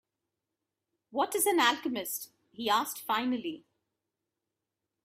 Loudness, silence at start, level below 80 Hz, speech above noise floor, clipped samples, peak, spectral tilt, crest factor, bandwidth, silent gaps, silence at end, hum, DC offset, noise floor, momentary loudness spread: -30 LUFS; 1.1 s; -82 dBFS; 57 dB; under 0.1%; -10 dBFS; -1.5 dB/octave; 24 dB; 16 kHz; none; 1.45 s; none; under 0.1%; -88 dBFS; 14 LU